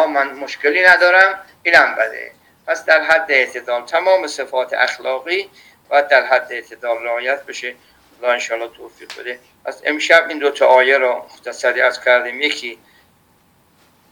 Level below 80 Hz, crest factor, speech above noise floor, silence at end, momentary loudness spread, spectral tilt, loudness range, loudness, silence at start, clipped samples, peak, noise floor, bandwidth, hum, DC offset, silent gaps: -66 dBFS; 16 dB; 39 dB; 1.35 s; 18 LU; -1 dB/octave; 6 LU; -15 LUFS; 0 s; under 0.1%; 0 dBFS; -55 dBFS; 19 kHz; none; under 0.1%; none